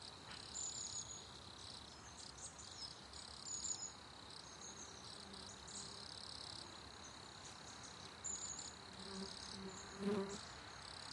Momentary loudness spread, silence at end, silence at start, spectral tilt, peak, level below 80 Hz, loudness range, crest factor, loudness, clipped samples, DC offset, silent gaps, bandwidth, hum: 10 LU; 0 s; 0 s; -2 dB/octave; -30 dBFS; -70 dBFS; 4 LU; 22 dB; -49 LUFS; under 0.1%; under 0.1%; none; 11.5 kHz; none